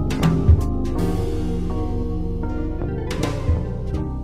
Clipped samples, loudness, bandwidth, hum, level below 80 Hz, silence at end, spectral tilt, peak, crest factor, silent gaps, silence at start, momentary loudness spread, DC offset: under 0.1%; -23 LUFS; 14.5 kHz; none; -24 dBFS; 0 s; -7.5 dB/octave; -2 dBFS; 18 dB; none; 0 s; 9 LU; under 0.1%